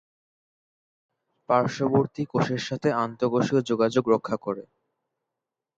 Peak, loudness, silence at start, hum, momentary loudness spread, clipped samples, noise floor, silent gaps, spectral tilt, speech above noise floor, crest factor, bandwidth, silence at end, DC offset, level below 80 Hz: -8 dBFS; -25 LUFS; 1.5 s; none; 6 LU; under 0.1%; -87 dBFS; none; -6.5 dB/octave; 62 dB; 20 dB; 8.8 kHz; 1.15 s; under 0.1%; -66 dBFS